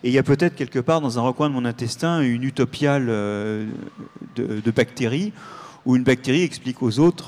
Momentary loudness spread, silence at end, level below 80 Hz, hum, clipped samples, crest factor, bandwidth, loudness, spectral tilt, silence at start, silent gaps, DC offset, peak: 12 LU; 0 s; -56 dBFS; none; under 0.1%; 16 dB; 13 kHz; -22 LUFS; -6.5 dB/octave; 0.05 s; none; under 0.1%; -6 dBFS